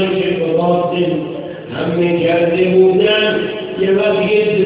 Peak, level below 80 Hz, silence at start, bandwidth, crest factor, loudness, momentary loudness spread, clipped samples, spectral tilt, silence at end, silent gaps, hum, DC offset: 0 dBFS; -50 dBFS; 0 s; 4 kHz; 14 dB; -14 LUFS; 11 LU; under 0.1%; -10.5 dB/octave; 0 s; none; none; under 0.1%